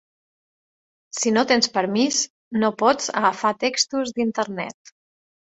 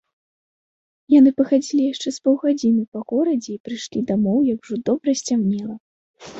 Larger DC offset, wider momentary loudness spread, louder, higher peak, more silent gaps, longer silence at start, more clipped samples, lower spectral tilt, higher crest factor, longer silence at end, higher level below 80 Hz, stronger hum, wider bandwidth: neither; second, 8 LU vs 13 LU; about the same, -21 LUFS vs -20 LUFS; about the same, -4 dBFS vs -4 dBFS; second, 2.30-2.51 s vs 2.88-2.92 s, 3.60-3.64 s, 5.80-6.14 s; about the same, 1.15 s vs 1.1 s; neither; second, -2.5 dB/octave vs -6 dB/octave; about the same, 20 dB vs 16 dB; first, 0.85 s vs 0 s; second, -68 dBFS vs -62 dBFS; neither; about the same, 8.2 kHz vs 8 kHz